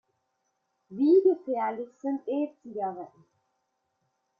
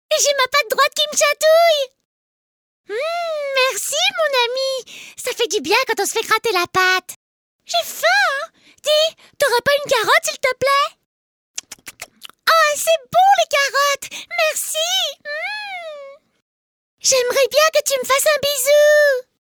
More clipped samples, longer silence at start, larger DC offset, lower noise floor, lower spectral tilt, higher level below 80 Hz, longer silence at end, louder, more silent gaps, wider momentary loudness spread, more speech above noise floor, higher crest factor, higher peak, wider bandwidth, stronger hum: neither; first, 0.9 s vs 0.1 s; neither; first, -78 dBFS vs -39 dBFS; first, -8.5 dB/octave vs 0.5 dB/octave; second, -82 dBFS vs -64 dBFS; first, 1.35 s vs 0.35 s; second, -28 LUFS vs -16 LUFS; second, none vs 2.05-2.84 s, 7.16-7.59 s, 11.06-11.54 s, 16.42-16.98 s; first, 19 LU vs 15 LU; first, 51 dB vs 22 dB; about the same, 18 dB vs 18 dB; second, -12 dBFS vs 0 dBFS; second, 4.9 kHz vs over 20 kHz; neither